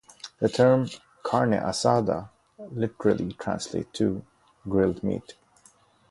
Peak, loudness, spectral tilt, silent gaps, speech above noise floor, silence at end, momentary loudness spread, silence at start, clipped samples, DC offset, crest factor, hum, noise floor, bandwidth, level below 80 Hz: -6 dBFS; -26 LUFS; -6 dB/octave; none; 35 dB; 0.8 s; 15 LU; 0.25 s; under 0.1%; under 0.1%; 20 dB; none; -59 dBFS; 11.5 kHz; -54 dBFS